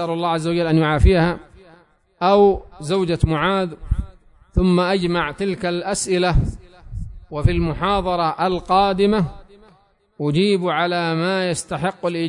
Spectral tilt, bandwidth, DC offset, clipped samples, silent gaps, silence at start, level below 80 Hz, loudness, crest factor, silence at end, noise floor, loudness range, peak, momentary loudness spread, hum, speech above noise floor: -6 dB/octave; 11 kHz; under 0.1%; under 0.1%; none; 0 s; -30 dBFS; -19 LUFS; 16 dB; 0 s; -56 dBFS; 3 LU; -2 dBFS; 11 LU; none; 38 dB